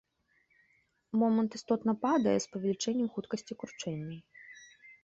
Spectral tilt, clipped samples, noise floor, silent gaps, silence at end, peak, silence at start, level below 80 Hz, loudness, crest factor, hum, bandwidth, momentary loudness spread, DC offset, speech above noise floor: -5.5 dB/octave; under 0.1%; -73 dBFS; none; 0.1 s; -16 dBFS; 1.15 s; -72 dBFS; -32 LUFS; 18 dB; none; 8 kHz; 20 LU; under 0.1%; 41 dB